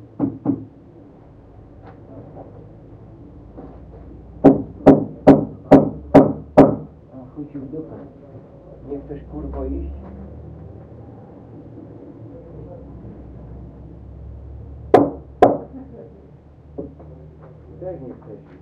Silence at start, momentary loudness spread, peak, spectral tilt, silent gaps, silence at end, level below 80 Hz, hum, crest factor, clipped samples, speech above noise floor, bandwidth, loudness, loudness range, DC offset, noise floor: 0.2 s; 27 LU; 0 dBFS; -9.5 dB/octave; none; 0.25 s; -40 dBFS; none; 22 dB; under 0.1%; 13 dB; 6.2 kHz; -16 LUFS; 24 LU; under 0.1%; -44 dBFS